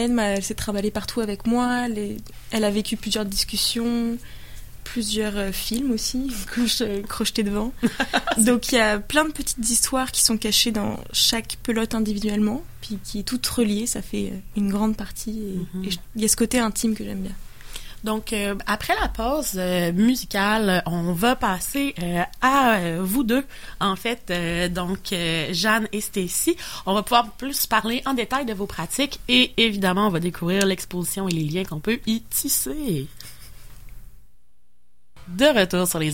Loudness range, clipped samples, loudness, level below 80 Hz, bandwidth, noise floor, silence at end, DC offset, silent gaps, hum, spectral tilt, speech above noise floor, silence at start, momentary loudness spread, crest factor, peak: 5 LU; under 0.1%; -22 LUFS; -40 dBFS; 17 kHz; -68 dBFS; 0 s; 0.9%; none; none; -3.5 dB/octave; 45 dB; 0 s; 11 LU; 20 dB; -2 dBFS